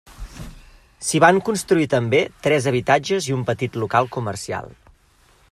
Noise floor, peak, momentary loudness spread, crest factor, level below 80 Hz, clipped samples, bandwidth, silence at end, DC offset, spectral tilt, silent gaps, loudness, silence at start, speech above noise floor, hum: -56 dBFS; 0 dBFS; 20 LU; 20 dB; -46 dBFS; under 0.1%; 14.5 kHz; 0.8 s; under 0.1%; -5 dB/octave; none; -20 LUFS; 0.1 s; 36 dB; none